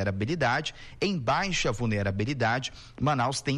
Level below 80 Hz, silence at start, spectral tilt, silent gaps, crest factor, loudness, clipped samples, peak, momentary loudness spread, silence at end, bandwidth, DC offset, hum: -46 dBFS; 0 s; -5 dB/octave; none; 10 dB; -28 LUFS; under 0.1%; -18 dBFS; 5 LU; 0 s; 11.5 kHz; under 0.1%; none